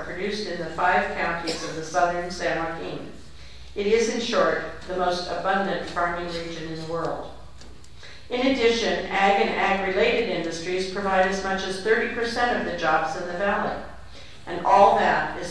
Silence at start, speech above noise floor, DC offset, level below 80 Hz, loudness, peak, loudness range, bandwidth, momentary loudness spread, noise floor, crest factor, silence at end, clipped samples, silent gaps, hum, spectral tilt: 0 s; 22 dB; 0.9%; -48 dBFS; -24 LUFS; -4 dBFS; 5 LU; 11 kHz; 13 LU; -46 dBFS; 20 dB; 0 s; under 0.1%; none; none; -4 dB/octave